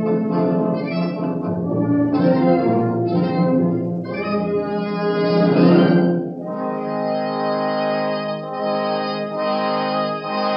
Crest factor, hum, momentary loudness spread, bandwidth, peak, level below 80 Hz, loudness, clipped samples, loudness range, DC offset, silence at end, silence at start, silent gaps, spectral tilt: 18 dB; none; 8 LU; 5.6 kHz; -2 dBFS; -62 dBFS; -19 LUFS; under 0.1%; 4 LU; under 0.1%; 0 s; 0 s; none; -10 dB/octave